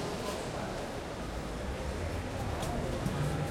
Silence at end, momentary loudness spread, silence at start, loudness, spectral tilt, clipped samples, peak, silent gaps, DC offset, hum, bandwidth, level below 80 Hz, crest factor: 0 s; 5 LU; 0 s; -37 LUFS; -5.5 dB/octave; under 0.1%; -20 dBFS; none; under 0.1%; none; 16.5 kHz; -44 dBFS; 14 dB